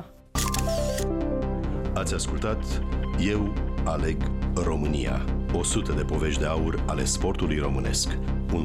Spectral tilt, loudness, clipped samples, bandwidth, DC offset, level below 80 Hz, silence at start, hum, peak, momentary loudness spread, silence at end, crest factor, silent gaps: -5 dB/octave; -27 LUFS; under 0.1%; 16 kHz; under 0.1%; -30 dBFS; 0 s; none; -14 dBFS; 4 LU; 0 s; 12 dB; none